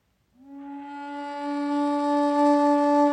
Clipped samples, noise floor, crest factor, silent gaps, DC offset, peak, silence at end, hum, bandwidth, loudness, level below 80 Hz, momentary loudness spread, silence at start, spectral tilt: under 0.1%; -55 dBFS; 12 dB; none; under 0.1%; -12 dBFS; 0 s; none; 9.8 kHz; -23 LUFS; -76 dBFS; 18 LU; 0.45 s; -4 dB/octave